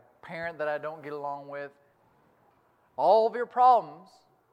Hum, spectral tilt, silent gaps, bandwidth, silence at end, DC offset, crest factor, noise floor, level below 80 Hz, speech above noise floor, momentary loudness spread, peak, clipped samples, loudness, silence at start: none; -6 dB/octave; none; 7.8 kHz; 0.55 s; under 0.1%; 20 dB; -66 dBFS; -80 dBFS; 39 dB; 21 LU; -10 dBFS; under 0.1%; -27 LUFS; 0.25 s